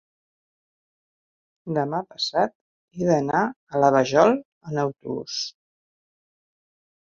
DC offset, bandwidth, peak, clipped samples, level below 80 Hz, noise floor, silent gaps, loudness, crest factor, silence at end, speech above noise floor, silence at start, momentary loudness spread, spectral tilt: under 0.1%; 7.6 kHz; -2 dBFS; under 0.1%; -64 dBFS; under -90 dBFS; 2.55-2.88 s, 3.56-3.67 s, 4.45-4.61 s; -23 LUFS; 22 dB; 1.55 s; over 68 dB; 1.65 s; 13 LU; -5.5 dB/octave